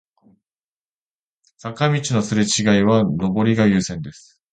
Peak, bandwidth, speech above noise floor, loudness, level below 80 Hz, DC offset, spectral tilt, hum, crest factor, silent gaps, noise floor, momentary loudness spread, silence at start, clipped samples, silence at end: -4 dBFS; 9.4 kHz; over 72 dB; -18 LUFS; -50 dBFS; under 0.1%; -5 dB/octave; none; 18 dB; none; under -90 dBFS; 17 LU; 1.65 s; under 0.1%; 0.4 s